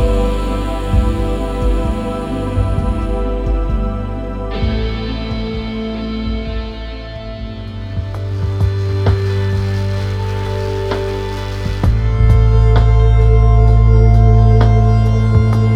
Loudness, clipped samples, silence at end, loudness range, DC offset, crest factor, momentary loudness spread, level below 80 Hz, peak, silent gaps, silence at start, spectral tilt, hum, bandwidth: -16 LUFS; under 0.1%; 0 s; 11 LU; under 0.1%; 14 dB; 13 LU; -16 dBFS; 0 dBFS; none; 0 s; -8 dB/octave; none; 9.6 kHz